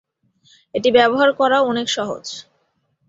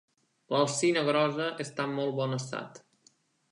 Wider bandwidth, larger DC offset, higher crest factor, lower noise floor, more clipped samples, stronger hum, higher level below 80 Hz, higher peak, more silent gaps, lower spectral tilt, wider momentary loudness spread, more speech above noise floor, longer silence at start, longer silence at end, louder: second, 7.8 kHz vs 11.5 kHz; neither; about the same, 18 dB vs 18 dB; about the same, -67 dBFS vs -66 dBFS; neither; neither; first, -62 dBFS vs -82 dBFS; first, -2 dBFS vs -12 dBFS; neither; about the same, -3.5 dB/octave vs -4.5 dB/octave; first, 15 LU vs 11 LU; first, 49 dB vs 37 dB; first, 0.75 s vs 0.5 s; about the same, 0.7 s vs 0.75 s; first, -17 LUFS vs -30 LUFS